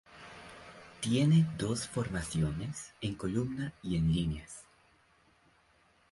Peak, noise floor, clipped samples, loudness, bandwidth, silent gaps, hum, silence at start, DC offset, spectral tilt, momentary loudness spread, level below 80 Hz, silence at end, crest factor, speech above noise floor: -18 dBFS; -68 dBFS; under 0.1%; -33 LUFS; 11.5 kHz; none; none; 0.1 s; under 0.1%; -6 dB/octave; 23 LU; -52 dBFS; 1.5 s; 16 dB; 36 dB